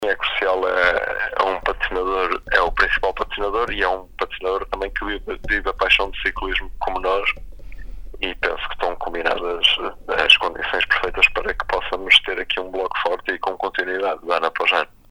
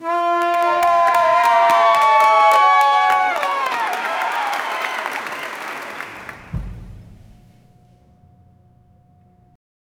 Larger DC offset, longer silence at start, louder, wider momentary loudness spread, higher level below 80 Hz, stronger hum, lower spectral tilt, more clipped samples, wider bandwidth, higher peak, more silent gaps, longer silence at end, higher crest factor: neither; about the same, 0 s vs 0 s; second, -20 LUFS vs -16 LUFS; second, 11 LU vs 19 LU; first, -36 dBFS vs -44 dBFS; neither; about the same, -3 dB/octave vs -3 dB/octave; neither; second, 16.5 kHz vs over 20 kHz; about the same, 0 dBFS vs 0 dBFS; neither; second, 0.25 s vs 2.95 s; about the same, 22 dB vs 18 dB